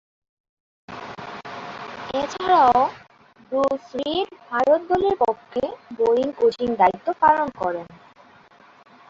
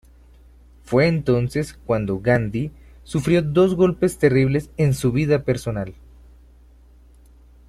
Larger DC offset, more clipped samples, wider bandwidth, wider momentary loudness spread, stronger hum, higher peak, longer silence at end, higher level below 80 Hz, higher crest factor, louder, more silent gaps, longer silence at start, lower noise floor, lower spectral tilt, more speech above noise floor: neither; neither; second, 7.6 kHz vs 14 kHz; first, 17 LU vs 10 LU; second, none vs 60 Hz at -40 dBFS; about the same, -4 dBFS vs -4 dBFS; second, 1.15 s vs 1.75 s; second, -56 dBFS vs -44 dBFS; about the same, 20 dB vs 18 dB; about the same, -21 LUFS vs -20 LUFS; neither; about the same, 0.9 s vs 0.85 s; about the same, -51 dBFS vs -49 dBFS; second, -5 dB/octave vs -7 dB/octave; about the same, 31 dB vs 30 dB